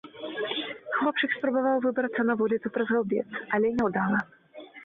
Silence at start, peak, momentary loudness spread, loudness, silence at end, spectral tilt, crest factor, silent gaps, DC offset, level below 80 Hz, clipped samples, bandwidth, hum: 0.05 s; -14 dBFS; 7 LU; -27 LUFS; 0 s; -7.5 dB/octave; 14 dB; none; under 0.1%; -66 dBFS; under 0.1%; 5.2 kHz; none